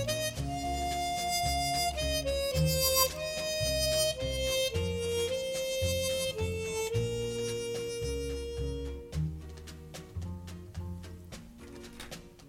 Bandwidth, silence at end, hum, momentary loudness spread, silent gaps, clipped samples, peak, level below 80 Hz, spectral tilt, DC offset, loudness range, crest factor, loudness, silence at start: 16.5 kHz; 0 s; none; 18 LU; none; under 0.1%; -12 dBFS; -44 dBFS; -3.5 dB/octave; under 0.1%; 11 LU; 22 dB; -32 LUFS; 0 s